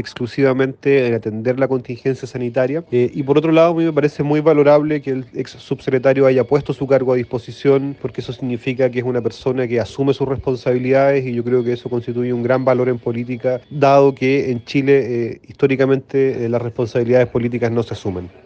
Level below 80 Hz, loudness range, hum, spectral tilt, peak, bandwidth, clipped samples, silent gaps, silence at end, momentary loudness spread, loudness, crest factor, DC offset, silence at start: -52 dBFS; 3 LU; none; -8 dB/octave; 0 dBFS; 7.8 kHz; under 0.1%; none; 0.15 s; 10 LU; -17 LUFS; 16 dB; under 0.1%; 0 s